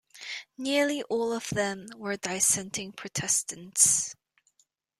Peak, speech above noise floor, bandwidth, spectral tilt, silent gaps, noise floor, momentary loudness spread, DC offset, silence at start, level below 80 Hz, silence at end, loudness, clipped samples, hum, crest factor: -4 dBFS; 42 dB; 16 kHz; -2 dB/octave; none; -71 dBFS; 15 LU; under 0.1%; 0.15 s; -68 dBFS; 0.85 s; -27 LUFS; under 0.1%; none; 26 dB